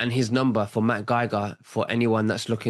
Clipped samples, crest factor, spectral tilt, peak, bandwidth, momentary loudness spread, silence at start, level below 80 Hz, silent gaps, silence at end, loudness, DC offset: under 0.1%; 14 dB; -6 dB/octave; -10 dBFS; 12.5 kHz; 6 LU; 0 s; -66 dBFS; none; 0 s; -24 LUFS; under 0.1%